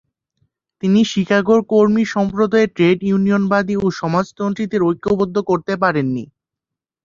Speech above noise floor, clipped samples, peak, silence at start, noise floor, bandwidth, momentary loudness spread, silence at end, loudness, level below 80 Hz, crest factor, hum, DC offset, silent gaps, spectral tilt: 69 dB; under 0.1%; -2 dBFS; 0.85 s; -85 dBFS; 7.4 kHz; 6 LU; 0.8 s; -17 LUFS; -52 dBFS; 16 dB; none; under 0.1%; none; -7 dB/octave